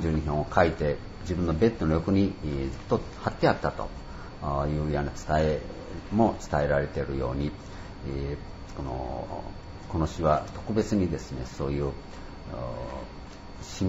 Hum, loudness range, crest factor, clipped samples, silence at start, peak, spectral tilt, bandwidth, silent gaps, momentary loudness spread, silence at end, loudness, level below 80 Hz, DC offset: none; 5 LU; 22 dB; under 0.1%; 0 s; -6 dBFS; -7 dB/octave; 8 kHz; none; 16 LU; 0 s; -29 LUFS; -40 dBFS; under 0.1%